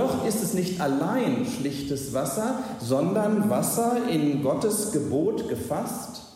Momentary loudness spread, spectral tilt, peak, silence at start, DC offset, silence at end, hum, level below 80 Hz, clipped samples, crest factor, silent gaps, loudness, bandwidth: 6 LU; -5.5 dB/octave; -12 dBFS; 0 s; under 0.1%; 0 s; none; -58 dBFS; under 0.1%; 14 dB; none; -26 LUFS; 16 kHz